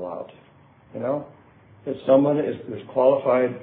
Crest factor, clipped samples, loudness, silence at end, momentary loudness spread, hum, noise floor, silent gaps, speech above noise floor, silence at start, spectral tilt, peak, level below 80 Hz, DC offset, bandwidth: 18 dB; under 0.1%; -22 LUFS; 0 s; 19 LU; none; -53 dBFS; none; 32 dB; 0 s; -11.5 dB/octave; -6 dBFS; -68 dBFS; under 0.1%; 4 kHz